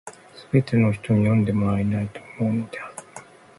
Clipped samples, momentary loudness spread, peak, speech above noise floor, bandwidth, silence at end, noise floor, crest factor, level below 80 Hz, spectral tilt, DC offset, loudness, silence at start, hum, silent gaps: under 0.1%; 20 LU; -6 dBFS; 24 dB; 11.5 kHz; 0.35 s; -45 dBFS; 16 dB; -48 dBFS; -8 dB/octave; under 0.1%; -23 LUFS; 0.05 s; none; none